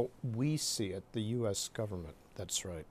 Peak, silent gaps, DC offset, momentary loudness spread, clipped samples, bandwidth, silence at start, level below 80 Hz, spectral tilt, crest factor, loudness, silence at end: -20 dBFS; none; under 0.1%; 10 LU; under 0.1%; 15 kHz; 0 s; -60 dBFS; -4.5 dB/octave; 18 dB; -37 LUFS; 0.05 s